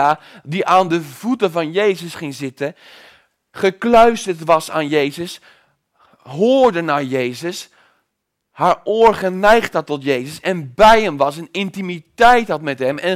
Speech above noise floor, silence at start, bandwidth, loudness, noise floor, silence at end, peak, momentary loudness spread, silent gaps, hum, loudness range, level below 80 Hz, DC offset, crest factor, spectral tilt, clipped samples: 58 dB; 0 s; 16 kHz; -16 LUFS; -74 dBFS; 0 s; 0 dBFS; 15 LU; none; none; 5 LU; -44 dBFS; under 0.1%; 16 dB; -5 dB/octave; under 0.1%